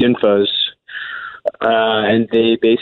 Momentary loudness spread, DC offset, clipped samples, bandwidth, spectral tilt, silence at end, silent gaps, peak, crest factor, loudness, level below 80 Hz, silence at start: 13 LU; under 0.1%; under 0.1%; 4.4 kHz; -8 dB/octave; 0 s; none; -4 dBFS; 12 dB; -15 LUFS; -56 dBFS; 0 s